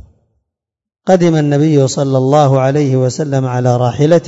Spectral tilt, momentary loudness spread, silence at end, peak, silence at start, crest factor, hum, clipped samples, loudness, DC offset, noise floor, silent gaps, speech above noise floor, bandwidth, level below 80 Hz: -7 dB/octave; 5 LU; 0 s; 0 dBFS; 1.05 s; 12 dB; none; under 0.1%; -12 LUFS; under 0.1%; -81 dBFS; none; 70 dB; 7.8 kHz; -54 dBFS